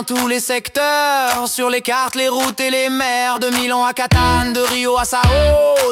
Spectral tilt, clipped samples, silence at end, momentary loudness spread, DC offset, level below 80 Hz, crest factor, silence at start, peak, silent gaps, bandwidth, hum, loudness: -3.5 dB/octave; under 0.1%; 0 s; 4 LU; under 0.1%; -30 dBFS; 14 dB; 0 s; -2 dBFS; none; 17.5 kHz; none; -15 LUFS